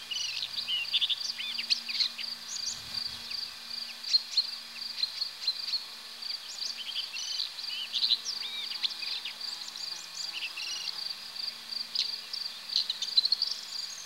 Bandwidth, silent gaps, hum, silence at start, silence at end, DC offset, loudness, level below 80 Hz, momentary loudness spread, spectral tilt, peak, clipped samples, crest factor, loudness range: 16.5 kHz; none; none; 0 s; 0 s; under 0.1%; -31 LUFS; -76 dBFS; 10 LU; 2 dB/octave; -12 dBFS; under 0.1%; 22 dB; 4 LU